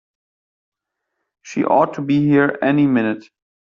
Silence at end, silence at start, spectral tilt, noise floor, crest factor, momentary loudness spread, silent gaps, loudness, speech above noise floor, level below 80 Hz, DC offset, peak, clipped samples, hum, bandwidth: 0.4 s; 1.45 s; -7.5 dB/octave; -77 dBFS; 16 dB; 9 LU; none; -17 LUFS; 61 dB; -60 dBFS; under 0.1%; -4 dBFS; under 0.1%; none; 7.2 kHz